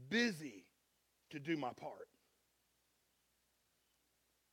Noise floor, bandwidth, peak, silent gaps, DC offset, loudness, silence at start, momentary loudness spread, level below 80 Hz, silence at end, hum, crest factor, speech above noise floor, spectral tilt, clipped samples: -81 dBFS; 16.5 kHz; -22 dBFS; none; under 0.1%; -42 LUFS; 0 s; 22 LU; -88 dBFS; 2.5 s; none; 24 dB; 39 dB; -4.5 dB/octave; under 0.1%